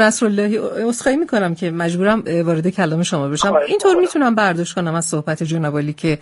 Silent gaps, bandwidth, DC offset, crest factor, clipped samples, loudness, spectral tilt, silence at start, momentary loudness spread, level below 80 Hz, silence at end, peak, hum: none; 11.5 kHz; under 0.1%; 16 dB; under 0.1%; -17 LUFS; -5 dB/octave; 0 s; 6 LU; -52 dBFS; 0.05 s; 0 dBFS; none